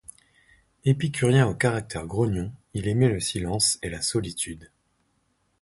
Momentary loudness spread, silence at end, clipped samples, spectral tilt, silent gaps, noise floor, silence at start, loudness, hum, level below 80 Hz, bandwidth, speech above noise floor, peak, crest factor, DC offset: 11 LU; 0.95 s; under 0.1%; -4.5 dB/octave; none; -70 dBFS; 0.85 s; -25 LUFS; none; -48 dBFS; 12 kHz; 46 dB; -8 dBFS; 18 dB; under 0.1%